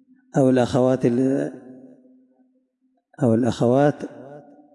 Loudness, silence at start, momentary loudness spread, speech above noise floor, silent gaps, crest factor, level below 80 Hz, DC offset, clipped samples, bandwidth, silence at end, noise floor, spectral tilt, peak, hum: -20 LUFS; 0.35 s; 17 LU; 50 dB; none; 16 dB; -62 dBFS; under 0.1%; under 0.1%; 11 kHz; 0.35 s; -69 dBFS; -7.5 dB/octave; -6 dBFS; none